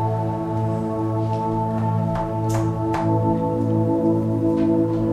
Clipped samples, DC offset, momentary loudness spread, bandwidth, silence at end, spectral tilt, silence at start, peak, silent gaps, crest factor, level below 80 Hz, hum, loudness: under 0.1%; under 0.1%; 4 LU; 12 kHz; 0 s; -9 dB/octave; 0 s; -8 dBFS; none; 12 dB; -42 dBFS; none; -22 LUFS